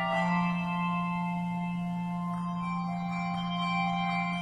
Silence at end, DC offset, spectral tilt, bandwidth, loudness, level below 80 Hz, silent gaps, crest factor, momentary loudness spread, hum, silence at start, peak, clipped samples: 0 s; under 0.1%; -7 dB/octave; 9 kHz; -31 LUFS; -60 dBFS; none; 14 dB; 5 LU; none; 0 s; -18 dBFS; under 0.1%